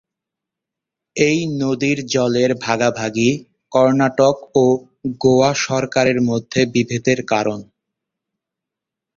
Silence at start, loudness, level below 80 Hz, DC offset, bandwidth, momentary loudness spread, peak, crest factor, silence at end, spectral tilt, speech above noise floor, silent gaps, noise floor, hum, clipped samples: 1.15 s; -17 LUFS; -54 dBFS; under 0.1%; 7.6 kHz; 6 LU; -2 dBFS; 16 dB; 1.55 s; -5 dB/octave; 68 dB; none; -84 dBFS; none; under 0.1%